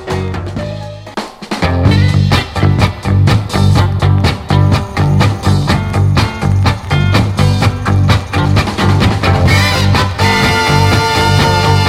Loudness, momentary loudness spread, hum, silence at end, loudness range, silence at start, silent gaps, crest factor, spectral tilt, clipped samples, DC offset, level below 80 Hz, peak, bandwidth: -11 LUFS; 8 LU; none; 0 s; 2 LU; 0 s; none; 10 dB; -6 dB/octave; 0.3%; under 0.1%; -26 dBFS; 0 dBFS; 14.5 kHz